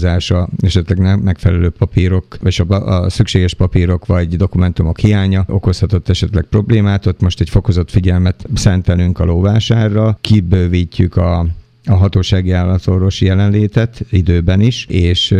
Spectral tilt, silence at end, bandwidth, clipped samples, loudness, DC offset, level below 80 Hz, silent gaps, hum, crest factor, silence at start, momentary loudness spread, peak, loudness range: -7 dB/octave; 0 s; 9.4 kHz; under 0.1%; -13 LUFS; under 0.1%; -26 dBFS; none; none; 12 dB; 0 s; 3 LU; 0 dBFS; 1 LU